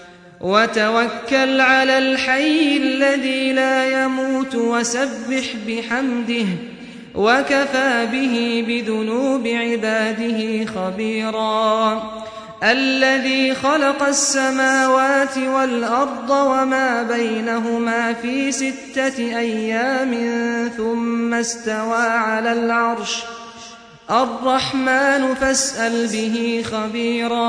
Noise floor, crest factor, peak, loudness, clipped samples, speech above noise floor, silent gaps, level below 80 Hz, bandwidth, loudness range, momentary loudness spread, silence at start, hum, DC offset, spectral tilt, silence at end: -40 dBFS; 16 dB; -2 dBFS; -18 LUFS; under 0.1%; 21 dB; none; -56 dBFS; 10.5 kHz; 4 LU; 7 LU; 0 s; none; under 0.1%; -3 dB/octave; 0 s